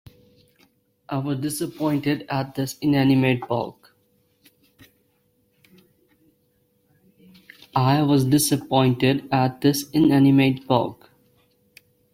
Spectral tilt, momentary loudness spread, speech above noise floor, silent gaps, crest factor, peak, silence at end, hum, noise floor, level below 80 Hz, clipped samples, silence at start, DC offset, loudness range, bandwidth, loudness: -6 dB/octave; 11 LU; 46 dB; none; 18 dB; -4 dBFS; 1.2 s; none; -66 dBFS; -58 dBFS; under 0.1%; 1.1 s; under 0.1%; 9 LU; 16 kHz; -21 LUFS